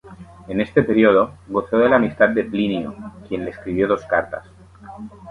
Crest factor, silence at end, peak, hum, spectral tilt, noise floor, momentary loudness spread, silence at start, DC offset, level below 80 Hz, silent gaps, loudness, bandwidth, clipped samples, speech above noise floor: 20 dB; 0 s; 0 dBFS; none; -8 dB/octave; -39 dBFS; 18 LU; 0.05 s; under 0.1%; -48 dBFS; none; -19 LUFS; 10.5 kHz; under 0.1%; 21 dB